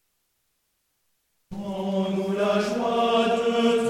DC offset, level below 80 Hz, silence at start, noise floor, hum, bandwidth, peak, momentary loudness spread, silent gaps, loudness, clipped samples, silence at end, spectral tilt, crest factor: under 0.1%; -60 dBFS; 1.5 s; -73 dBFS; none; 14 kHz; -10 dBFS; 11 LU; none; -24 LUFS; under 0.1%; 0 s; -5.5 dB/octave; 16 dB